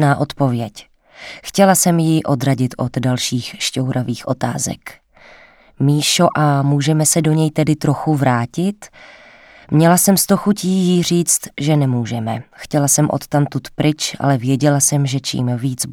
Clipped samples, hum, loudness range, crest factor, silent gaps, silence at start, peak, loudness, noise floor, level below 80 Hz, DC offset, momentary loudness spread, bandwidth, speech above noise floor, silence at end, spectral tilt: under 0.1%; none; 4 LU; 16 dB; none; 0 s; 0 dBFS; -16 LUFS; -45 dBFS; -52 dBFS; under 0.1%; 9 LU; 17.5 kHz; 29 dB; 0 s; -5 dB/octave